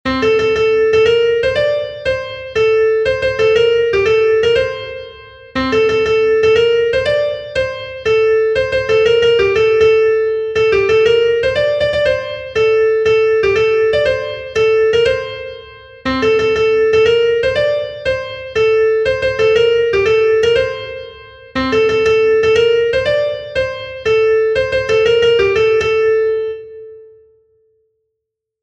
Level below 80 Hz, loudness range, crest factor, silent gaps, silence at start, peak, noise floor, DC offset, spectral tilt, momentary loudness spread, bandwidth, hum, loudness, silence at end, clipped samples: -40 dBFS; 2 LU; 12 dB; none; 0.05 s; 0 dBFS; -78 dBFS; under 0.1%; -4.5 dB/octave; 9 LU; 8 kHz; none; -14 LUFS; 1.6 s; under 0.1%